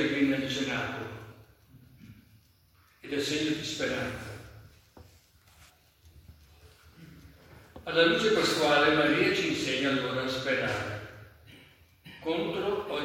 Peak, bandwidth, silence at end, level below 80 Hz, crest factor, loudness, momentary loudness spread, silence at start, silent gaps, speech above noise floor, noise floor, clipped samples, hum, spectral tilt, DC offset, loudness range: -10 dBFS; 16.5 kHz; 0 s; -62 dBFS; 22 dB; -28 LUFS; 19 LU; 0 s; none; 35 dB; -63 dBFS; under 0.1%; none; -4 dB/octave; under 0.1%; 10 LU